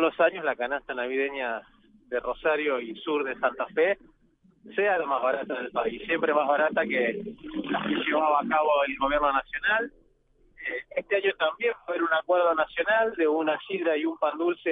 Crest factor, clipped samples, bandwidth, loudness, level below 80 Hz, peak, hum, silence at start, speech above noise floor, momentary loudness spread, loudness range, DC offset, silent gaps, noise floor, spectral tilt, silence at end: 18 dB; under 0.1%; 4.7 kHz; -27 LUFS; -58 dBFS; -10 dBFS; none; 0 s; 36 dB; 9 LU; 3 LU; under 0.1%; none; -63 dBFS; -7.5 dB/octave; 0 s